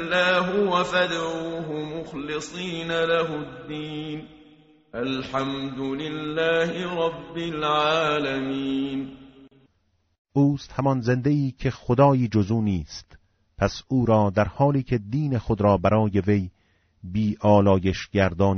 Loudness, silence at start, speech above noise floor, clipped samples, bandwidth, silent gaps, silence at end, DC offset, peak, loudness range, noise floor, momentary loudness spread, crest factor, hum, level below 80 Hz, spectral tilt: -24 LUFS; 0 s; 45 dB; under 0.1%; 8 kHz; 10.18-10.25 s; 0 s; under 0.1%; -4 dBFS; 6 LU; -69 dBFS; 12 LU; 18 dB; none; -48 dBFS; -5 dB/octave